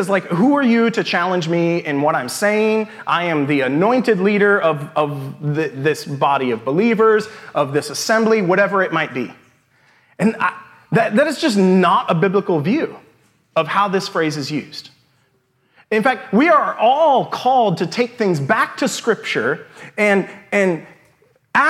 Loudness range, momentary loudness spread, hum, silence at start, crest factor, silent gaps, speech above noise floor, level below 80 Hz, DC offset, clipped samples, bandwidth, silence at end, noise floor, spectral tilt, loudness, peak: 3 LU; 8 LU; none; 0 s; 16 dB; none; 45 dB; -70 dBFS; under 0.1%; under 0.1%; 15 kHz; 0 s; -62 dBFS; -5.5 dB/octave; -17 LUFS; -2 dBFS